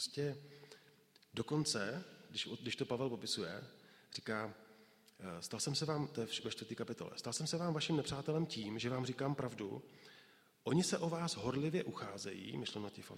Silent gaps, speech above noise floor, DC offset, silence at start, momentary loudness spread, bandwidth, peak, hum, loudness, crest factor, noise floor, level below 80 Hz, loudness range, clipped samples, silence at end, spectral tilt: none; 27 dB; under 0.1%; 0 s; 14 LU; 16 kHz; -22 dBFS; none; -41 LUFS; 20 dB; -68 dBFS; -74 dBFS; 3 LU; under 0.1%; 0 s; -4.5 dB/octave